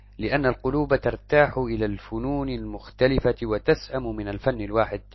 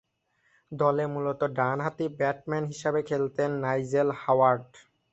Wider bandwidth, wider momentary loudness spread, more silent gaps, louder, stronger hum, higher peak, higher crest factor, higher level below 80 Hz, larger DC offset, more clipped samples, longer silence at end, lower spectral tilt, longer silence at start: second, 6 kHz vs 8.2 kHz; about the same, 10 LU vs 8 LU; neither; about the same, -25 LUFS vs -27 LUFS; neither; first, -4 dBFS vs -10 dBFS; about the same, 20 dB vs 18 dB; first, -38 dBFS vs -68 dBFS; neither; neither; second, 0.15 s vs 0.35 s; about the same, -8 dB/octave vs -7 dB/octave; second, 0.2 s vs 0.7 s